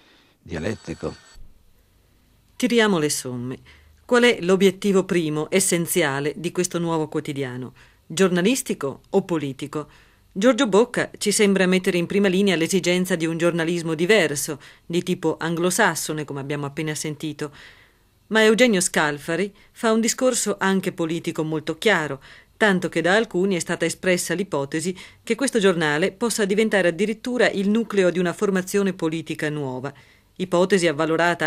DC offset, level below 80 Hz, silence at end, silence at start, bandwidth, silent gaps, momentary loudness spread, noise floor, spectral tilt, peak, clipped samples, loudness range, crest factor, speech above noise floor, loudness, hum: under 0.1%; -58 dBFS; 0 s; 0.45 s; 16 kHz; none; 12 LU; -58 dBFS; -4 dB/octave; -2 dBFS; under 0.1%; 4 LU; 20 dB; 37 dB; -21 LUFS; none